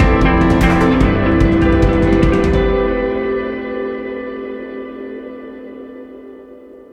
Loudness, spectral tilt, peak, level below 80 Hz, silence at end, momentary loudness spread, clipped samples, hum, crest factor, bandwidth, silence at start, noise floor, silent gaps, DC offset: -15 LUFS; -8 dB/octave; 0 dBFS; -22 dBFS; 0.15 s; 20 LU; under 0.1%; none; 14 dB; 10.5 kHz; 0 s; -38 dBFS; none; under 0.1%